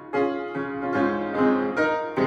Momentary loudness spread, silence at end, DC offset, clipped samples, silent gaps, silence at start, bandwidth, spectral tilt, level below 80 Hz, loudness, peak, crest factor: 7 LU; 0 s; under 0.1%; under 0.1%; none; 0 s; 7.6 kHz; -7 dB/octave; -60 dBFS; -24 LUFS; -10 dBFS; 14 dB